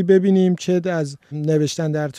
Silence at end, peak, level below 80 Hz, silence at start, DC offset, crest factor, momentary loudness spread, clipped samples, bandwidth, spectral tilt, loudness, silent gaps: 0 s; -4 dBFS; -64 dBFS; 0 s; under 0.1%; 14 dB; 10 LU; under 0.1%; 11 kHz; -7 dB/octave; -19 LUFS; none